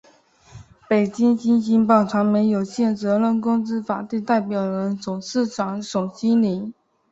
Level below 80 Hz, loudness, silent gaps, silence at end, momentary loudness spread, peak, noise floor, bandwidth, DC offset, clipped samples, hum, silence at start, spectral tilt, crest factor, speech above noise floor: -62 dBFS; -21 LUFS; none; 0.4 s; 9 LU; -2 dBFS; -53 dBFS; 7.8 kHz; under 0.1%; under 0.1%; none; 0.55 s; -7 dB/octave; 18 dB; 33 dB